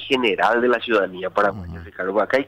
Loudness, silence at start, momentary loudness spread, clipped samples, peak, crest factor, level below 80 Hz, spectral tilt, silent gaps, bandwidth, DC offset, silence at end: -20 LUFS; 0 s; 11 LU; under 0.1%; -8 dBFS; 14 dB; -50 dBFS; -5.5 dB/octave; none; 15 kHz; under 0.1%; 0 s